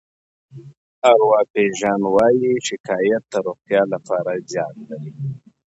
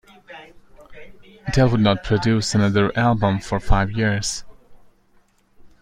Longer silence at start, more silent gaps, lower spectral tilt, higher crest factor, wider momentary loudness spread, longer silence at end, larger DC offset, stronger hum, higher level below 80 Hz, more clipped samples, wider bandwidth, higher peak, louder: first, 0.55 s vs 0.3 s; first, 0.77-1.02 s, 1.50-1.54 s, 2.80-2.84 s vs none; about the same, -5 dB/octave vs -5.5 dB/octave; about the same, 18 dB vs 18 dB; second, 15 LU vs 19 LU; first, 0.4 s vs 0.15 s; neither; neither; second, -62 dBFS vs -32 dBFS; neither; second, 8.2 kHz vs 11.5 kHz; about the same, 0 dBFS vs -2 dBFS; about the same, -19 LUFS vs -20 LUFS